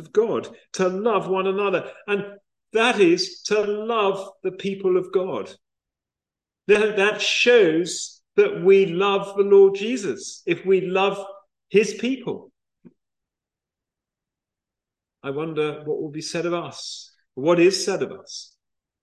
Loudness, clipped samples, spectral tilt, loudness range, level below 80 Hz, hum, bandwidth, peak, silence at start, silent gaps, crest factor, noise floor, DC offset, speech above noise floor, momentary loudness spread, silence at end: -21 LUFS; under 0.1%; -4.5 dB/octave; 13 LU; -72 dBFS; none; 10.5 kHz; -4 dBFS; 0 s; none; 18 dB; -89 dBFS; under 0.1%; 68 dB; 16 LU; 0.6 s